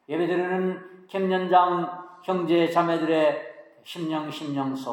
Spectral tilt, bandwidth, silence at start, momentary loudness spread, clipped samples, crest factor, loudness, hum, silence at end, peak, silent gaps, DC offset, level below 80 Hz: -6.5 dB/octave; 17 kHz; 0.1 s; 14 LU; under 0.1%; 18 dB; -25 LUFS; none; 0 s; -6 dBFS; none; under 0.1%; -84 dBFS